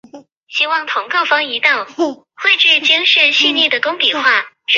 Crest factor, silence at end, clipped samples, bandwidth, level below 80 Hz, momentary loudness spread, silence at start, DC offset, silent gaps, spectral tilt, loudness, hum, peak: 14 dB; 0 s; under 0.1%; 7.8 kHz; -72 dBFS; 9 LU; 0.15 s; under 0.1%; 0.32-0.47 s; -0.5 dB/octave; -12 LUFS; none; 0 dBFS